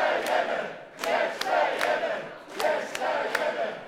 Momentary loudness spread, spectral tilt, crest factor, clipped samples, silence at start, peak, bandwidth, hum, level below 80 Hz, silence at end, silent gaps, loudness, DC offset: 8 LU; -2 dB/octave; 20 dB; under 0.1%; 0 s; -8 dBFS; 16 kHz; none; -72 dBFS; 0 s; none; -27 LUFS; under 0.1%